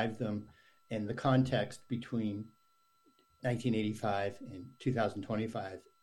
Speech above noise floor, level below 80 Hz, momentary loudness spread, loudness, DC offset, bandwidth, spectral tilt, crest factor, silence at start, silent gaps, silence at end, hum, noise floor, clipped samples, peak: 38 dB; -66 dBFS; 13 LU; -36 LUFS; under 0.1%; 12 kHz; -7 dB/octave; 20 dB; 0 s; none; 0.2 s; none; -73 dBFS; under 0.1%; -16 dBFS